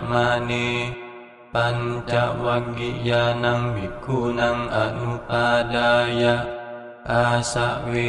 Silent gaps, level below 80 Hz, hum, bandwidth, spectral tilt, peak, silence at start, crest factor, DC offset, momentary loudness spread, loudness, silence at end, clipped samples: none; -44 dBFS; none; 11.5 kHz; -5.5 dB/octave; -6 dBFS; 0 s; 16 dB; under 0.1%; 10 LU; -22 LUFS; 0 s; under 0.1%